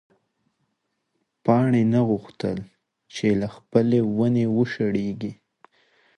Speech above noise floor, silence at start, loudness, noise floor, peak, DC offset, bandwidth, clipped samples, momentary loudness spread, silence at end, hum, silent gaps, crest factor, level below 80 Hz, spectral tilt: 54 dB; 1.45 s; -23 LUFS; -76 dBFS; -4 dBFS; under 0.1%; 9.4 kHz; under 0.1%; 11 LU; 0.85 s; none; none; 20 dB; -58 dBFS; -8 dB/octave